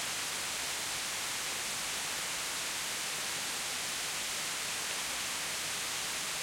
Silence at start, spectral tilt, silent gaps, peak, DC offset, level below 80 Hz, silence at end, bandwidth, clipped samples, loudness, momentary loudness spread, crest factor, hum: 0 s; 0.5 dB/octave; none; -22 dBFS; under 0.1%; -66 dBFS; 0 s; 16.5 kHz; under 0.1%; -34 LUFS; 0 LU; 14 dB; none